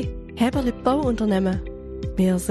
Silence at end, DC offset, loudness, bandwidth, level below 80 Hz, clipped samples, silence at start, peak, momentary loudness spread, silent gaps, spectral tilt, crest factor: 0 s; under 0.1%; -23 LUFS; 13.5 kHz; -36 dBFS; under 0.1%; 0 s; -6 dBFS; 10 LU; none; -6.5 dB/octave; 16 dB